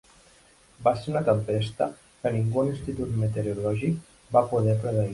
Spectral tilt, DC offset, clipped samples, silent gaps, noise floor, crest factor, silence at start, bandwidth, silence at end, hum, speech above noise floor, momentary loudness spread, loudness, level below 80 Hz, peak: -8 dB/octave; under 0.1%; under 0.1%; none; -57 dBFS; 18 dB; 0.8 s; 11.5 kHz; 0 s; none; 32 dB; 6 LU; -27 LUFS; -52 dBFS; -8 dBFS